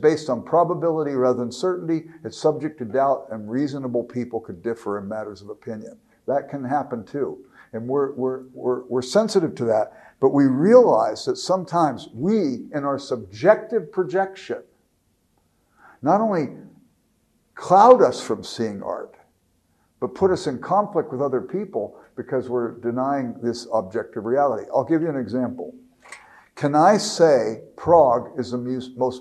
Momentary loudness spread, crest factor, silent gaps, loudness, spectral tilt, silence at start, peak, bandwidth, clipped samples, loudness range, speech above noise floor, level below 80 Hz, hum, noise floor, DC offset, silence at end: 15 LU; 22 dB; none; -22 LUFS; -6 dB/octave; 0 s; 0 dBFS; 12 kHz; under 0.1%; 8 LU; 45 dB; -64 dBFS; none; -66 dBFS; under 0.1%; 0 s